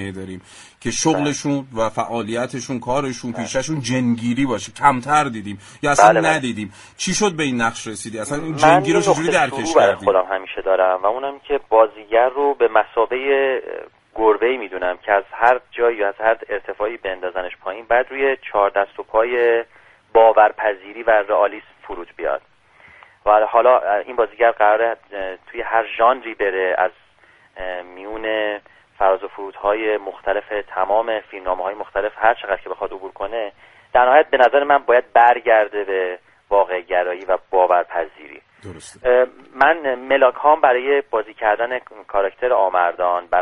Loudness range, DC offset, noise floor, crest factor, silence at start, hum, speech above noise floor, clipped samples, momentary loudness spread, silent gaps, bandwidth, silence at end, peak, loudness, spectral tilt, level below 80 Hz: 6 LU; under 0.1%; -53 dBFS; 18 dB; 0 s; none; 35 dB; under 0.1%; 14 LU; none; 11.5 kHz; 0 s; 0 dBFS; -18 LUFS; -4 dB/octave; -50 dBFS